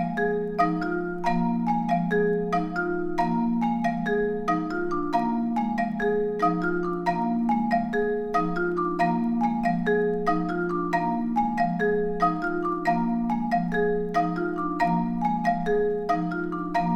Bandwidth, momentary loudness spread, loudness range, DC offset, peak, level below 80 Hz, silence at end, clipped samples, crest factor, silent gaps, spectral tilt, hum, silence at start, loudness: 8.6 kHz; 3 LU; 1 LU; under 0.1%; -10 dBFS; -48 dBFS; 0 s; under 0.1%; 16 dB; none; -8 dB/octave; none; 0 s; -25 LUFS